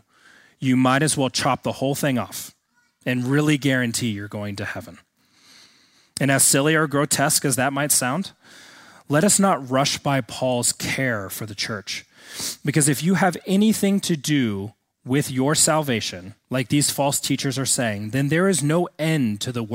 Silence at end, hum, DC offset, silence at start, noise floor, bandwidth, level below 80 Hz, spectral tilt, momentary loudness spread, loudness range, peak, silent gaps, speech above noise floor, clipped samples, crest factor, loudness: 0 s; none; under 0.1%; 0.6 s; -57 dBFS; 16.5 kHz; -60 dBFS; -4 dB/octave; 12 LU; 4 LU; -4 dBFS; none; 36 dB; under 0.1%; 18 dB; -21 LUFS